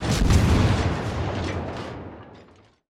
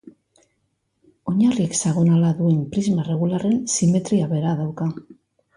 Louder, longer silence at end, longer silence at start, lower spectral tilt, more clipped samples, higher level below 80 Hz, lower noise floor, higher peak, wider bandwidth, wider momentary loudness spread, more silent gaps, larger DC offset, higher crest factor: second, -23 LUFS vs -20 LUFS; about the same, 0.55 s vs 0.45 s; about the same, 0 s vs 0.05 s; about the same, -6 dB/octave vs -6.5 dB/octave; neither; first, -30 dBFS vs -58 dBFS; second, -52 dBFS vs -71 dBFS; about the same, -8 dBFS vs -8 dBFS; first, 14.5 kHz vs 11 kHz; first, 19 LU vs 8 LU; neither; neither; about the same, 16 dB vs 12 dB